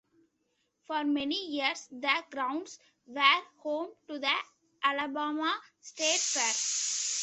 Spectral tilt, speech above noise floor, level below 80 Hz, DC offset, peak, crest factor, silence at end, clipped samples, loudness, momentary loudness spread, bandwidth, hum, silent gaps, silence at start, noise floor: 1 dB/octave; 46 dB; -80 dBFS; under 0.1%; -8 dBFS; 24 dB; 0 s; under 0.1%; -30 LUFS; 11 LU; 8.6 kHz; none; none; 0.9 s; -78 dBFS